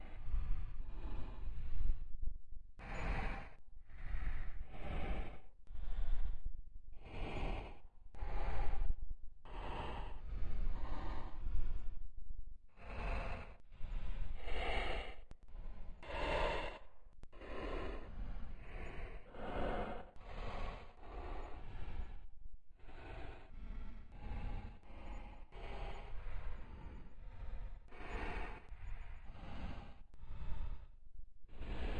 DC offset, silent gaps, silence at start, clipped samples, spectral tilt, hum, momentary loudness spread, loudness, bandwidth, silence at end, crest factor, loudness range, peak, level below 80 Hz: under 0.1%; none; 0 s; under 0.1%; -6.5 dB/octave; none; 14 LU; -48 LUFS; 4.9 kHz; 0 s; 16 dB; 8 LU; -22 dBFS; -44 dBFS